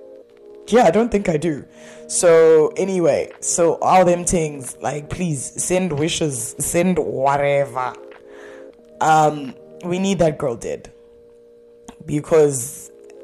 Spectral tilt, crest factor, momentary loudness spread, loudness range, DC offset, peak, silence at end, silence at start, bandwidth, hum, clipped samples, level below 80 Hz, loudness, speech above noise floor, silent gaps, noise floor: -4.5 dB/octave; 14 dB; 14 LU; 5 LU; under 0.1%; -6 dBFS; 0 s; 0 s; 13 kHz; none; under 0.1%; -46 dBFS; -18 LUFS; 29 dB; none; -47 dBFS